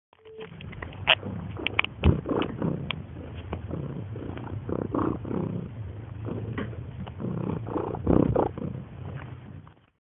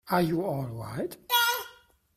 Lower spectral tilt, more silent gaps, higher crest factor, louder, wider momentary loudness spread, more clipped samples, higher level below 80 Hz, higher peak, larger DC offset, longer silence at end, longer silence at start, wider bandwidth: first, -10.5 dB/octave vs -4 dB/octave; neither; first, 28 dB vs 20 dB; about the same, -30 LUFS vs -28 LUFS; first, 16 LU vs 12 LU; neither; first, -42 dBFS vs -60 dBFS; first, -2 dBFS vs -10 dBFS; neither; about the same, 0.35 s vs 0.45 s; first, 0.25 s vs 0.05 s; second, 4 kHz vs 16 kHz